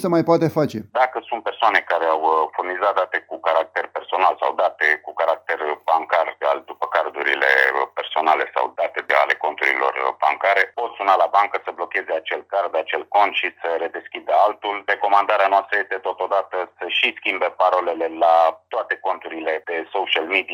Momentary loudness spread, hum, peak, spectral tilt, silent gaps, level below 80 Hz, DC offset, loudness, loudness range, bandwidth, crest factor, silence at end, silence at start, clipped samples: 8 LU; none; -2 dBFS; -5 dB/octave; none; -72 dBFS; under 0.1%; -20 LUFS; 2 LU; 18.5 kHz; 18 dB; 0 s; 0 s; under 0.1%